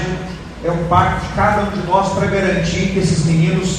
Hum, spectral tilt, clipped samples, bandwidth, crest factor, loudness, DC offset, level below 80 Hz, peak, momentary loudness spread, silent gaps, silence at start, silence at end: none; -6 dB/octave; under 0.1%; 10 kHz; 16 dB; -16 LUFS; under 0.1%; -32 dBFS; 0 dBFS; 8 LU; none; 0 s; 0 s